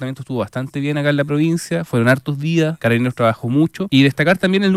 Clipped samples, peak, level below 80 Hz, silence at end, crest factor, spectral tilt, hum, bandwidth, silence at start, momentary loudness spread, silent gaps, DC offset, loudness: under 0.1%; -2 dBFS; -56 dBFS; 0 s; 14 dB; -6.5 dB/octave; none; 14.5 kHz; 0 s; 8 LU; none; under 0.1%; -17 LUFS